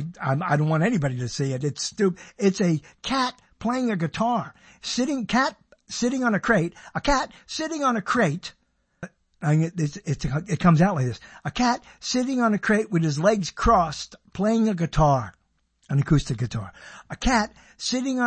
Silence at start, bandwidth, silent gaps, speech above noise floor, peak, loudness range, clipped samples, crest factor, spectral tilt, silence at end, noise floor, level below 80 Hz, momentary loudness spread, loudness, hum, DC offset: 0 s; 8.8 kHz; none; 43 dB; -4 dBFS; 3 LU; under 0.1%; 20 dB; -5.5 dB/octave; 0 s; -67 dBFS; -42 dBFS; 11 LU; -24 LUFS; none; under 0.1%